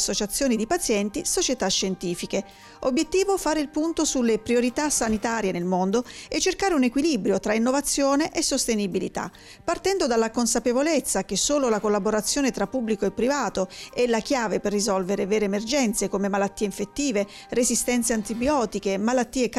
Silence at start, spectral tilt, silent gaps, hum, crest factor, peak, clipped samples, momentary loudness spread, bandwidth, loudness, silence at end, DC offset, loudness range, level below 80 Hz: 0 s; -3.5 dB/octave; none; none; 12 dB; -12 dBFS; under 0.1%; 6 LU; 16 kHz; -24 LUFS; 0 s; under 0.1%; 2 LU; -48 dBFS